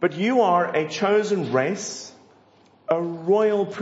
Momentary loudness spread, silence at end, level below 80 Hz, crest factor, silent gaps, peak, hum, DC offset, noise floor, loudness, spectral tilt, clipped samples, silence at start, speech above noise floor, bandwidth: 13 LU; 0 s; -76 dBFS; 16 dB; none; -6 dBFS; none; under 0.1%; -56 dBFS; -22 LUFS; -5 dB/octave; under 0.1%; 0 s; 34 dB; 8 kHz